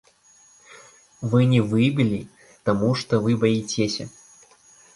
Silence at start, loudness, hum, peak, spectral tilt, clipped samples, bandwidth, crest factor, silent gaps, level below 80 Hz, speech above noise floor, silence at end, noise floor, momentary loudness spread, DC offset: 0.7 s; -22 LUFS; none; -6 dBFS; -6.5 dB/octave; under 0.1%; 11.5 kHz; 18 dB; none; -56 dBFS; 35 dB; 0.85 s; -55 dBFS; 12 LU; under 0.1%